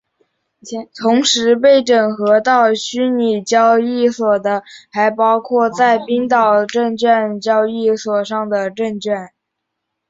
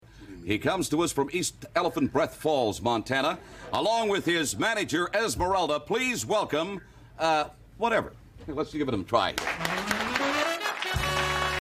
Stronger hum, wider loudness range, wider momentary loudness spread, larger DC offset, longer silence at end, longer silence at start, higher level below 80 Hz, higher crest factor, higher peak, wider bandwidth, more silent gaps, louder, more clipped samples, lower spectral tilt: neither; about the same, 3 LU vs 2 LU; about the same, 9 LU vs 7 LU; neither; first, 0.85 s vs 0 s; first, 0.65 s vs 0.15 s; second, -62 dBFS vs -48 dBFS; second, 14 dB vs 20 dB; first, -2 dBFS vs -8 dBFS; second, 8 kHz vs 15.5 kHz; neither; first, -15 LUFS vs -27 LUFS; neither; about the same, -3.5 dB/octave vs -3.5 dB/octave